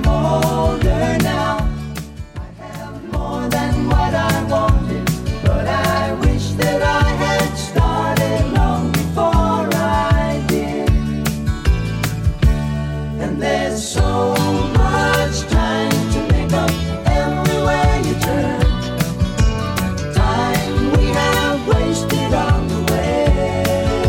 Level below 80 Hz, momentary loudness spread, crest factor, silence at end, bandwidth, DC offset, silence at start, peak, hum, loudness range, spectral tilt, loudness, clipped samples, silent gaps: -22 dBFS; 5 LU; 12 dB; 0 s; 17 kHz; under 0.1%; 0 s; -4 dBFS; none; 3 LU; -6 dB/octave; -17 LUFS; under 0.1%; none